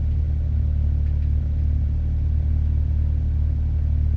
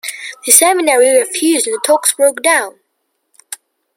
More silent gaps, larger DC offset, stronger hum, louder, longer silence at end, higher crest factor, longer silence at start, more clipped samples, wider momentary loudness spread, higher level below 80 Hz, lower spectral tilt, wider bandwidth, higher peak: neither; neither; neither; second, -23 LUFS vs -11 LUFS; second, 0 s vs 0.4 s; second, 8 dB vs 14 dB; about the same, 0 s vs 0.05 s; second, under 0.1% vs 0.2%; second, 1 LU vs 23 LU; first, -22 dBFS vs -70 dBFS; first, -10.5 dB/octave vs 1 dB/octave; second, 2.4 kHz vs over 20 kHz; second, -12 dBFS vs 0 dBFS